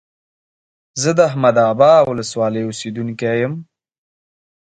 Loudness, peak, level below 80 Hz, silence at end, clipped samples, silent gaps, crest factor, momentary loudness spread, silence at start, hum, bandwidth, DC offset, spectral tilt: -16 LUFS; 0 dBFS; -58 dBFS; 1.05 s; under 0.1%; none; 18 dB; 14 LU; 0.95 s; none; 9.4 kHz; under 0.1%; -5 dB/octave